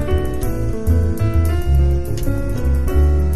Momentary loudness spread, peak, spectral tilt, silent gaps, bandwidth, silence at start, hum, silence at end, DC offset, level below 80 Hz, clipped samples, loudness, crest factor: 6 LU; -4 dBFS; -8 dB/octave; none; 13.5 kHz; 0 s; none; 0 s; 6%; -18 dBFS; under 0.1%; -19 LUFS; 12 dB